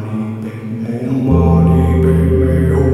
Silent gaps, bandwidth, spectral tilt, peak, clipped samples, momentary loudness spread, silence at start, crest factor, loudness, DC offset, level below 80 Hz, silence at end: none; 12 kHz; -10 dB/octave; 0 dBFS; under 0.1%; 12 LU; 0 s; 12 dB; -14 LUFS; under 0.1%; -22 dBFS; 0 s